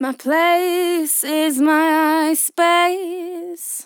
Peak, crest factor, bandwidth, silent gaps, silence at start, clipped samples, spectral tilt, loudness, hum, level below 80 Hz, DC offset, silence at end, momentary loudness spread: -4 dBFS; 14 dB; over 20 kHz; none; 0 s; under 0.1%; -0.5 dB/octave; -17 LUFS; none; under -90 dBFS; under 0.1%; 0 s; 12 LU